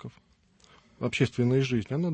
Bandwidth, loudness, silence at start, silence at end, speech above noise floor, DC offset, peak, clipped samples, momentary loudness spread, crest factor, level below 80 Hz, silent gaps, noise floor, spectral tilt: 8.8 kHz; -27 LUFS; 0.05 s; 0 s; 36 dB; under 0.1%; -12 dBFS; under 0.1%; 10 LU; 18 dB; -60 dBFS; none; -63 dBFS; -7 dB/octave